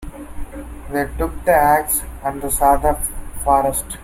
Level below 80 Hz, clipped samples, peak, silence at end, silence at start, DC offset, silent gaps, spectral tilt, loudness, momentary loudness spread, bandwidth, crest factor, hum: -30 dBFS; under 0.1%; -2 dBFS; 0 s; 0 s; under 0.1%; none; -4.5 dB/octave; -18 LUFS; 19 LU; 16.5 kHz; 18 dB; none